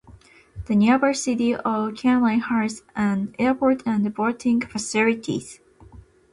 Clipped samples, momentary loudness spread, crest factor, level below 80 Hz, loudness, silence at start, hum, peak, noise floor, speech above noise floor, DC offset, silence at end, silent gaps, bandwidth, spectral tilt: under 0.1%; 8 LU; 14 dB; -52 dBFS; -22 LUFS; 0.1 s; none; -8 dBFS; -49 dBFS; 28 dB; under 0.1%; 0.35 s; none; 11.5 kHz; -5.5 dB/octave